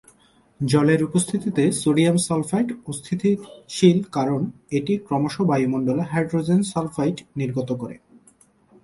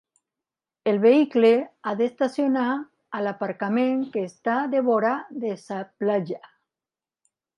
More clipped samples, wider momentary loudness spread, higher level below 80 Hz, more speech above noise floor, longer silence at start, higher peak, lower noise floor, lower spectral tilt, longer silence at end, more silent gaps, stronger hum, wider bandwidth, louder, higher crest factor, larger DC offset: neither; second, 10 LU vs 13 LU; first, -58 dBFS vs -78 dBFS; second, 36 dB vs over 67 dB; second, 0.6 s vs 0.85 s; first, -2 dBFS vs -6 dBFS; second, -57 dBFS vs under -90 dBFS; about the same, -6 dB/octave vs -7 dB/octave; second, 0.85 s vs 1.2 s; neither; neither; about the same, 11.5 kHz vs 10.5 kHz; about the same, -22 LUFS vs -23 LUFS; about the same, 20 dB vs 18 dB; neither